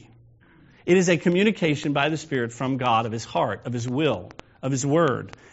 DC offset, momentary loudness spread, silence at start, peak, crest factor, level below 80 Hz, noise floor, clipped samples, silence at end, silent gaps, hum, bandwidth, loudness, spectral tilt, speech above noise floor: under 0.1%; 10 LU; 0.85 s; -6 dBFS; 18 dB; -60 dBFS; -54 dBFS; under 0.1%; 0.25 s; none; none; 8 kHz; -23 LUFS; -5 dB/octave; 31 dB